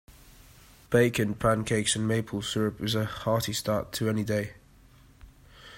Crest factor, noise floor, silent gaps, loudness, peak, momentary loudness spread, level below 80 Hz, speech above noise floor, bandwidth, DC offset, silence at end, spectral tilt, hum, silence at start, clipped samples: 20 dB; -56 dBFS; none; -28 LUFS; -8 dBFS; 6 LU; -52 dBFS; 29 dB; 16 kHz; under 0.1%; 0 s; -4.5 dB/octave; none; 0.1 s; under 0.1%